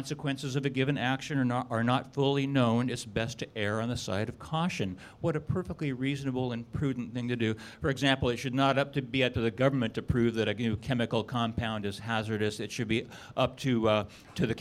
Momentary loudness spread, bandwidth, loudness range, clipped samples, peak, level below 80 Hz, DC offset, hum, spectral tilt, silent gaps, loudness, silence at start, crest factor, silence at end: 7 LU; 14 kHz; 4 LU; under 0.1%; -10 dBFS; -54 dBFS; under 0.1%; none; -6 dB/octave; none; -31 LUFS; 0 s; 20 dB; 0 s